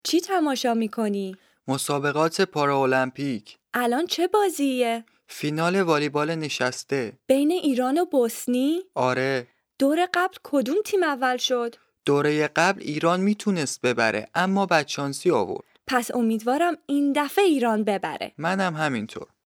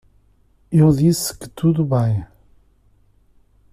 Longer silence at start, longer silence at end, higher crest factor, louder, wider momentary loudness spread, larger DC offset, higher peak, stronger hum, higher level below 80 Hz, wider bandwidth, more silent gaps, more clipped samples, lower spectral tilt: second, 0.05 s vs 0.7 s; second, 0.25 s vs 1.45 s; about the same, 18 dB vs 16 dB; second, -24 LUFS vs -18 LUFS; about the same, 8 LU vs 9 LU; neither; about the same, -6 dBFS vs -4 dBFS; neither; second, -72 dBFS vs -46 dBFS; first, 19.5 kHz vs 15 kHz; neither; neither; second, -4.5 dB/octave vs -7 dB/octave